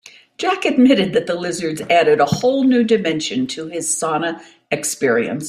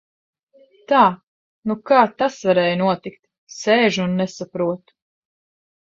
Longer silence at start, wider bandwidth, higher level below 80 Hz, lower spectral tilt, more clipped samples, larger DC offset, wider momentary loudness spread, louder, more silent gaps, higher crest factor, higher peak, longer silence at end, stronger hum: second, 0.05 s vs 0.9 s; first, 15 kHz vs 7.8 kHz; first, -58 dBFS vs -64 dBFS; second, -4 dB/octave vs -5.5 dB/octave; neither; neither; second, 10 LU vs 15 LU; about the same, -17 LUFS vs -19 LUFS; second, none vs 1.23-1.63 s, 3.38-3.47 s; about the same, 16 dB vs 20 dB; about the same, -2 dBFS vs -2 dBFS; second, 0 s vs 1.2 s; neither